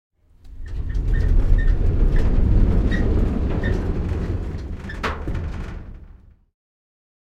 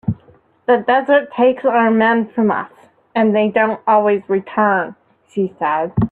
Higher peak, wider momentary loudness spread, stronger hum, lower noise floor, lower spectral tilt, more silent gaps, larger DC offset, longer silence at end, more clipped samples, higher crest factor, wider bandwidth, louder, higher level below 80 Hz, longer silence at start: about the same, -4 dBFS vs -2 dBFS; about the same, 13 LU vs 11 LU; neither; second, -46 dBFS vs -50 dBFS; about the same, -8.5 dB/octave vs -9 dB/octave; neither; neither; first, 1.1 s vs 0.05 s; neither; about the same, 16 dB vs 14 dB; first, 6.2 kHz vs 4.4 kHz; second, -23 LUFS vs -16 LUFS; first, -22 dBFS vs -50 dBFS; first, 0.45 s vs 0.05 s